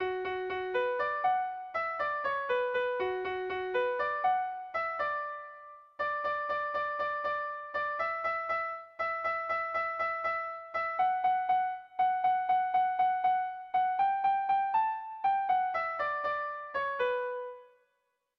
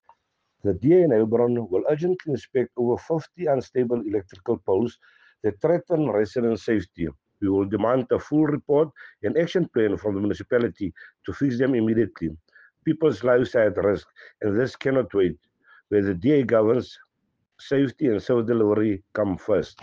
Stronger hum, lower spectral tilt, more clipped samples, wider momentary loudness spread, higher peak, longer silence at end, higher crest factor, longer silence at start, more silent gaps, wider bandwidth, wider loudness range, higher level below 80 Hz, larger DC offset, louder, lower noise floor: neither; second, -5.5 dB/octave vs -8.5 dB/octave; neither; about the same, 7 LU vs 9 LU; second, -18 dBFS vs -8 dBFS; first, 0.75 s vs 0.15 s; about the same, 14 dB vs 16 dB; second, 0 s vs 0.65 s; neither; second, 5.8 kHz vs 7.4 kHz; about the same, 4 LU vs 3 LU; second, -70 dBFS vs -56 dBFS; neither; second, -32 LUFS vs -24 LUFS; first, -79 dBFS vs -75 dBFS